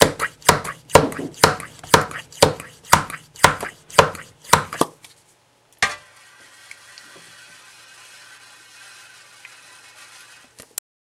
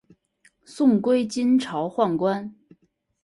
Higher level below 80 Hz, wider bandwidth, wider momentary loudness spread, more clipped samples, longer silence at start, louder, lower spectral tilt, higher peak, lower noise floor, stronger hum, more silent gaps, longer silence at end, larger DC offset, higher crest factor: first, -46 dBFS vs -66 dBFS; first, 16.5 kHz vs 11.5 kHz; first, 23 LU vs 8 LU; neither; second, 0 s vs 0.7 s; first, -19 LUFS vs -22 LUFS; second, -3 dB/octave vs -6.5 dB/octave; first, 0 dBFS vs -8 dBFS; second, -58 dBFS vs -62 dBFS; neither; neither; first, 5.1 s vs 0.75 s; neither; first, 22 dB vs 16 dB